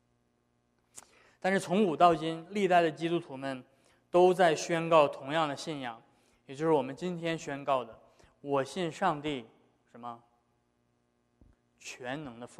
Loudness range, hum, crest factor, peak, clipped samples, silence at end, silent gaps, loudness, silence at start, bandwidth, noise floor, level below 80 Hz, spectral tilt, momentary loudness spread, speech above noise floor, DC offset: 10 LU; 60 Hz at -75 dBFS; 22 dB; -10 dBFS; under 0.1%; 0.15 s; none; -30 LUFS; 0.95 s; 13 kHz; -74 dBFS; -70 dBFS; -5.5 dB/octave; 20 LU; 45 dB; under 0.1%